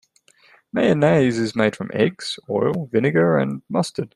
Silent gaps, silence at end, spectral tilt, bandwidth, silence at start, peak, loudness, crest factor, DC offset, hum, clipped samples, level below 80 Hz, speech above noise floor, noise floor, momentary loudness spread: none; 0.1 s; -6.5 dB/octave; 12 kHz; 0.75 s; -4 dBFS; -20 LUFS; 18 dB; under 0.1%; none; under 0.1%; -60 dBFS; 36 dB; -56 dBFS; 7 LU